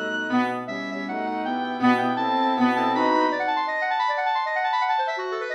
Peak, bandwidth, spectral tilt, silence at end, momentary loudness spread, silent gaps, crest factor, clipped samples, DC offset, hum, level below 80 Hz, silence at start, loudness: -8 dBFS; 10 kHz; -5 dB/octave; 0 s; 7 LU; none; 16 dB; under 0.1%; under 0.1%; none; -78 dBFS; 0 s; -23 LUFS